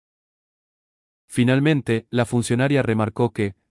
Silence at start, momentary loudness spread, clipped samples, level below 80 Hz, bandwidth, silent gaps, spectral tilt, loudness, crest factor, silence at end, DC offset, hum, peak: 1.3 s; 5 LU; under 0.1%; -56 dBFS; 12 kHz; none; -6.5 dB/octave; -21 LUFS; 16 dB; 0.2 s; under 0.1%; none; -6 dBFS